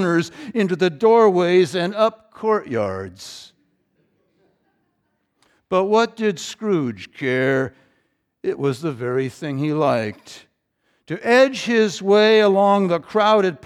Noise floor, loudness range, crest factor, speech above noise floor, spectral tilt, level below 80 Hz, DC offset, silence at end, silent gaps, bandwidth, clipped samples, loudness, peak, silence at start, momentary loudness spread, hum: -70 dBFS; 8 LU; 16 dB; 52 dB; -5.5 dB/octave; -68 dBFS; under 0.1%; 0.1 s; none; 12.5 kHz; under 0.1%; -19 LUFS; -4 dBFS; 0 s; 14 LU; none